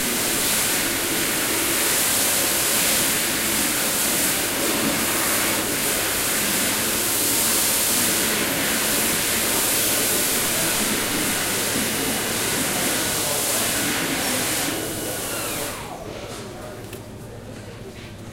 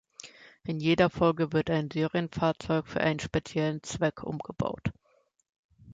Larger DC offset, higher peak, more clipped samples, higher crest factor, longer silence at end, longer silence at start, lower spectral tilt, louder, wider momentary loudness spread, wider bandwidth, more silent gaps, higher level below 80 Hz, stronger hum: neither; first, -6 dBFS vs -10 dBFS; neither; about the same, 16 dB vs 20 dB; about the same, 0 s vs 0 s; second, 0 s vs 0.25 s; second, -1.5 dB/octave vs -6 dB/octave; first, -19 LUFS vs -29 LUFS; first, 16 LU vs 13 LU; first, 16 kHz vs 9.2 kHz; second, none vs 5.49-5.69 s; first, -48 dBFS vs -54 dBFS; neither